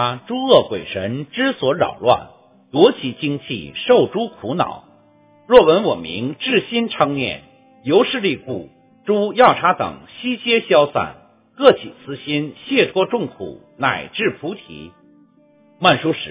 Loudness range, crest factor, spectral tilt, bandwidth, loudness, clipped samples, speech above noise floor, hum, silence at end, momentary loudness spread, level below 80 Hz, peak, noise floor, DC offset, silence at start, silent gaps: 5 LU; 18 dB; -9.5 dB/octave; 4 kHz; -18 LUFS; under 0.1%; 35 dB; none; 0 s; 16 LU; -54 dBFS; 0 dBFS; -53 dBFS; under 0.1%; 0 s; none